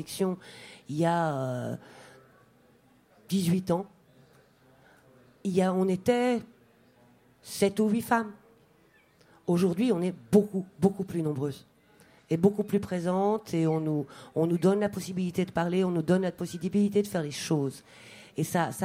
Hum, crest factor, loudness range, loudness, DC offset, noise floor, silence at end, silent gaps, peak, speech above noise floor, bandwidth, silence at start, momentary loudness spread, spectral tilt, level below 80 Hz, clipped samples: none; 20 dB; 5 LU; -28 LUFS; under 0.1%; -62 dBFS; 0 s; none; -10 dBFS; 35 dB; 16 kHz; 0 s; 12 LU; -6.5 dB/octave; -66 dBFS; under 0.1%